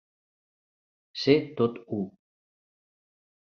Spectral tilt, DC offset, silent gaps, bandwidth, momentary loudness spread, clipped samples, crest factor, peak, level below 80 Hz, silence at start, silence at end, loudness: -7 dB/octave; under 0.1%; none; 6.8 kHz; 14 LU; under 0.1%; 24 dB; -8 dBFS; -68 dBFS; 1.15 s; 1.35 s; -27 LUFS